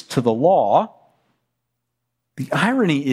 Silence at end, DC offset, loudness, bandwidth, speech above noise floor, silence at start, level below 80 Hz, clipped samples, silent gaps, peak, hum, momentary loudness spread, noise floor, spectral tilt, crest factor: 0 s; under 0.1%; -18 LUFS; 15 kHz; 60 dB; 0.1 s; -64 dBFS; under 0.1%; none; -4 dBFS; none; 12 LU; -77 dBFS; -6.5 dB/octave; 16 dB